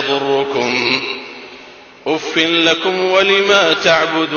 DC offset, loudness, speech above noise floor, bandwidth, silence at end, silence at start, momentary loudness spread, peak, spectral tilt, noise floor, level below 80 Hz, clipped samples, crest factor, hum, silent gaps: under 0.1%; -13 LUFS; 25 dB; 7.2 kHz; 0 s; 0 s; 15 LU; 0 dBFS; -3 dB/octave; -39 dBFS; -58 dBFS; under 0.1%; 14 dB; none; none